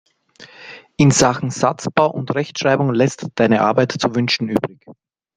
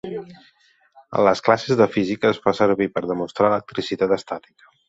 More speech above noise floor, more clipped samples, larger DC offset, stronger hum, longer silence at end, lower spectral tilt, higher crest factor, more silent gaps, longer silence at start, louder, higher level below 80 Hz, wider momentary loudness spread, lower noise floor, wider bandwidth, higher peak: second, 28 dB vs 33 dB; neither; neither; neither; about the same, 0.45 s vs 0.5 s; about the same, -5 dB/octave vs -6 dB/octave; about the same, 18 dB vs 20 dB; neither; first, 0.4 s vs 0.05 s; first, -17 LUFS vs -20 LUFS; first, -52 dBFS vs -58 dBFS; about the same, 13 LU vs 11 LU; second, -45 dBFS vs -54 dBFS; first, 9.8 kHz vs 8 kHz; about the same, 0 dBFS vs -2 dBFS